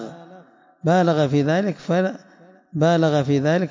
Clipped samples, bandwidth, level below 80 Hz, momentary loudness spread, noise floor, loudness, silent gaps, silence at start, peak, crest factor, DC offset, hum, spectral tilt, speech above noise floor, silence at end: under 0.1%; 7.6 kHz; -62 dBFS; 11 LU; -49 dBFS; -20 LUFS; none; 0 s; -6 dBFS; 14 dB; under 0.1%; none; -7 dB/octave; 30 dB; 0 s